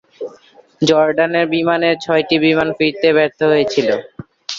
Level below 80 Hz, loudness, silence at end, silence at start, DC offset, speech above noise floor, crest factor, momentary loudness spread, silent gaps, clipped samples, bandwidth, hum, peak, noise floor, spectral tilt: -56 dBFS; -15 LUFS; 0 s; 0.2 s; under 0.1%; 32 dB; 14 dB; 11 LU; none; under 0.1%; 7.6 kHz; none; -2 dBFS; -46 dBFS; -5 dB/octave